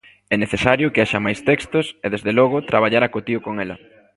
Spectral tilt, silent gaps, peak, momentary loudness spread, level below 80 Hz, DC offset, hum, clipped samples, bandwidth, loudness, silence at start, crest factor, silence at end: -6 dB/octave; none; 0 dBFS; 8 LU; -48 dBFS; under 0.1%; none; under 0.1%; 11.5 kHz; -19 LUFS; 0.3 s; 20 dB; 0.4 s